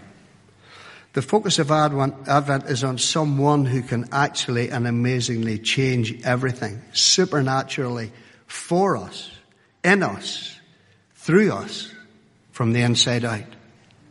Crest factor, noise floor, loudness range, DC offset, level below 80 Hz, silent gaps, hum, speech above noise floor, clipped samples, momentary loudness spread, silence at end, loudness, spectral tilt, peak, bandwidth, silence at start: 20 dB; -57 dBFS; 3 LU; under 0.1%; -60 dBFS; none; none; 35 dB; under 0.1%; 14 LU; 0.55 s; -21 LUFS; -4.5 dB/octave; -2 dBFS; 11.5 kHz; 0 s